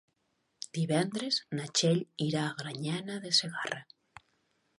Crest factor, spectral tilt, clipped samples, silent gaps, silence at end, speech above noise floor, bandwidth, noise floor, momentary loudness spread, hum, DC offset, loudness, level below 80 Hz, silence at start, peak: 22 dB; -4 dB/octave; under 0.1%; none; 0.95 s; 46 dB; 11.5 kHz; -78 dBFS; 10 LU; none; under 0.1%; -31 LUFS; -78 dBFS; 0.6 s; -12 dBFS